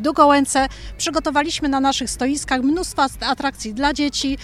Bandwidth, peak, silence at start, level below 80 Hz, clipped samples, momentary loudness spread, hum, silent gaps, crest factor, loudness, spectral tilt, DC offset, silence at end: 14 kHz; -2 dBFS; 0 s; -38 dBFS; under 0.1%; 8 LU; none; none; 18 dB; -19 LUFS; -3 dB/octave; under 0.1%; 0 s